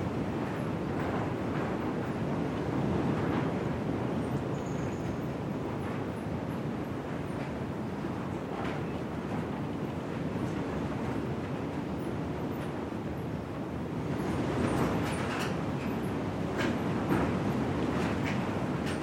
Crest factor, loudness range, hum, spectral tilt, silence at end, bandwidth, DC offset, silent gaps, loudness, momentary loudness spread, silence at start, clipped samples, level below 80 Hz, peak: 18 dB; 4 LU; none; -7 dB/octave; 0 s; 16.5 kHz; under 0.1%; none; -33 LUFS; 6 LU; 0 s; under 0.1%; -52 dBFS; -14 dBFS